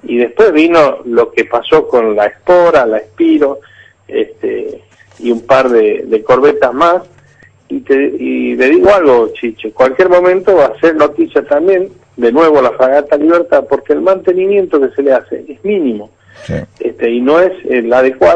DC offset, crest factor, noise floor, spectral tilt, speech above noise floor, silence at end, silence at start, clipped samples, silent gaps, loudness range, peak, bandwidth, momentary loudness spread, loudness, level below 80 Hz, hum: under 0.1%; 10 dB; -44 dBFS; -6.5 dB/octave; 34 dB; 0 s; 0.05 s; under 0.1%; none; 4 LU; 0 dBFS; 8.4 kHz; 11 LU; -10 LUFS; -46 dBFS; none